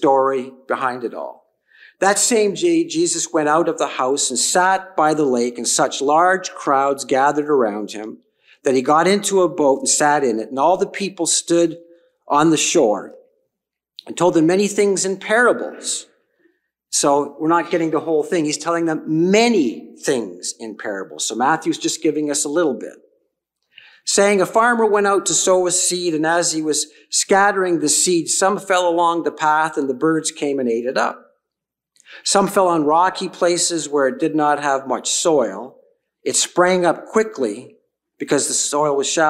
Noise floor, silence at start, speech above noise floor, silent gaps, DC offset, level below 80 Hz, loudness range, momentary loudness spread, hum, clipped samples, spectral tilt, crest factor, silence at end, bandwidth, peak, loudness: -83 dBFS; 0 s; 66 dB; none; under 0.1%; -68 dBFS; 4 LU; 9 LU; none; under 0.1%; -3 dB/octave; 16 dB; 0 s; 15.5 kHz; -2 dBFS; -17 LUFS